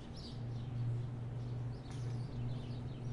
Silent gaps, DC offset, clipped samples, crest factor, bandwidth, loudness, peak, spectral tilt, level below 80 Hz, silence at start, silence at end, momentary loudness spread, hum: none; under 0.1%; under 0.1%; 10 dB; 10.5 kHz; -43 LUFS; -30 dBFS; -7.5 dB/octave; -56 dBFS; 0 s; 0 s; 4 LU; none